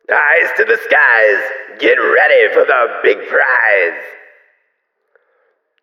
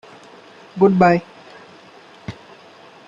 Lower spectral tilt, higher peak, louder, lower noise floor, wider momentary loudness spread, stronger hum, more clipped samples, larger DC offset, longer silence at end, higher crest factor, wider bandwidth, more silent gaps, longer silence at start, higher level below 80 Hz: second, -3 dB/octave vs -8.5 dB/octave; about the same, 0 dBFS vs -2 dBFS; first, -11 LUFS vs -16 LUFS; first, -67 dBFS vs -45 dBFS; second, 8 LU vs 23 LU; neither; neither; neither; first, 1.7 s vs 0.75 s; second, 14 dB vs 20 dB; first, 14 kHz vs 7.4 kHz; neither; second, 0.1 s vs 0.75 s; second, -70 dBFS vs -58 dBFS